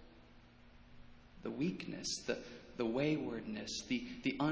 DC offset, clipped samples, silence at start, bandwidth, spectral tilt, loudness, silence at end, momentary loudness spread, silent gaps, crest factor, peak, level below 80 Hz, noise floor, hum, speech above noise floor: under 0.1%; under 0.1%; 0 s; 8 kHz; -4.5 dB/octave; -40 LUFS; 0 s; 8 LU; none; 18 dB; -22 dBFS; -64 dBFS; -61 dBFS; none; 22 dB